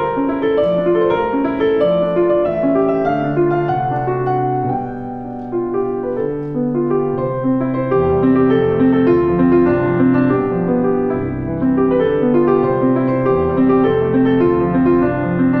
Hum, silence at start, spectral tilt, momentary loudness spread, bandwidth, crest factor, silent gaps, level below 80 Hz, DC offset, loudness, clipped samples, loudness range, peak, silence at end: none; 0 s; -10.5 dB/octave; 7 LU; 4.5 kHz; 12 dB; none; -40 dBFS; under 0.1%; -16 LUFS; under 0.1%; 5 LU; -2 dBFS; 0 s